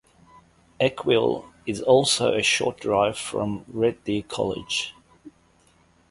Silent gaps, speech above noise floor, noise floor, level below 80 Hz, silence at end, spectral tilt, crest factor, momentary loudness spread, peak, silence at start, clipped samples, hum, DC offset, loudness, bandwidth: none; 37 dB; -60 dBFS; -56 dBFS; 0.8 s; -3.5 dB/octave; 20 dB; 10 LU; -4 dBFS; 0.8 s; under 0.1%; none; under 0.1%; -23 LUFS; 11.5 kHz